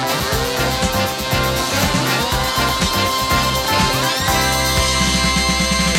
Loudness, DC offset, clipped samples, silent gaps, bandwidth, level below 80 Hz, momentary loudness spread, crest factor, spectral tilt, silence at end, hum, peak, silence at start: -16 LUFS; under 0.1%; under 0.1%; none; 17 kHz; -28 dBFS; 3 LU; 14 dB; -3 dB/octave; 0 s; none; -2 dBFS; 0 s